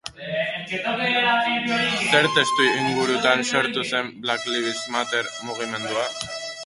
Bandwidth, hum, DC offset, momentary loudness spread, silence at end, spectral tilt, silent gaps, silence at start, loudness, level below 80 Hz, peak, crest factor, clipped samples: 11.5 kHz; none; under 0.1%; 9 LU; 0 s; -3 dB/octave; none; 0.05 s; -22 LUFS; -62 dBFS; -2 dBFS; 20 dB; under 0.1%